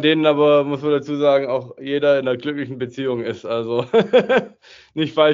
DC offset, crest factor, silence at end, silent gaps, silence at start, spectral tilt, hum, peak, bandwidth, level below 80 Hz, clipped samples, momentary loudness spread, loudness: under 0.1%; 16 dB; 0 s; none; 0 s; -4 dB/octave; none; -2 dBFS; 7.4 kHz; -64 dBFS; under 0.1%; 10 LU; -19 LUFS